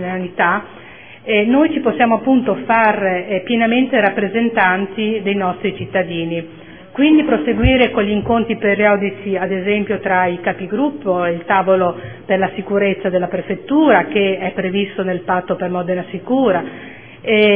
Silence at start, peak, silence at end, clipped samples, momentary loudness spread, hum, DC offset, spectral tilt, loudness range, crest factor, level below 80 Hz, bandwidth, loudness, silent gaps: 0 s; 0 dBFS; 0 s; under 0.1%; 9 LU; none; 0.4%; -10 dB/octave; 3 LU; 16 dB; -38 dBFS; 3.6 kHz; -16 LUFS; none